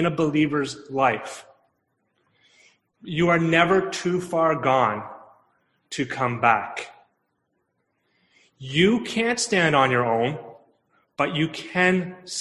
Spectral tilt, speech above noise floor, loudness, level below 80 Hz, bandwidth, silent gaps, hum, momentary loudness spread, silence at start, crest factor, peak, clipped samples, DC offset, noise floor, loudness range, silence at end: -5 dB/octave; 51 dB; -22 LUFS; -60 dBFS; 12 kHz; none; none; 16 LU; 0 s; 20 dB; -4 dBFS; under 0.1%; under 0.1%; -74 dBFS; 5 LU; 0 s